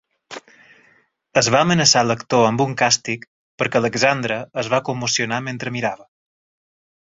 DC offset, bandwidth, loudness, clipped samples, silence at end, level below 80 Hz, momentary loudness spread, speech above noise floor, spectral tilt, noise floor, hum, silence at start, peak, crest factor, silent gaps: under 0.1%; 8 kHz; -18 LUFS; under 0.1%; 1.1 s; -58 dBFS; 15 LU; 39 dB; -3.5 dB/octave; -58 dBFS; none; 0.3 s; 0 dBFS; 20 dB; 3.28-3.58 s